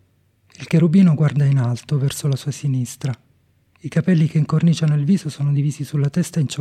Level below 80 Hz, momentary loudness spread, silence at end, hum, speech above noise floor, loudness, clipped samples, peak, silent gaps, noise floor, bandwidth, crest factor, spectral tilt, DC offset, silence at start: -58 dBFS; 10 LU; 0 s; none; 42 dB; -19 LUFS; under 0.1%; -4 dBFS; none; -59 dBFS; 13.5 kHz; 14 dB; -7 dB/octave; under 0.1%; 0.6 s